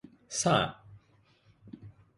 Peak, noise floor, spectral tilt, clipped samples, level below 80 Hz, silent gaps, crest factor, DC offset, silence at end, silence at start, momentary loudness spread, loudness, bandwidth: -12 dBFS; -65 dBFS; -3.5 dB/octave; under 0.1%; -62 dBFS; none; 22 dB; under 0.1%; 0.3 s; 0.3 s; 24 LU; -29 LUFS; 11.5 kHz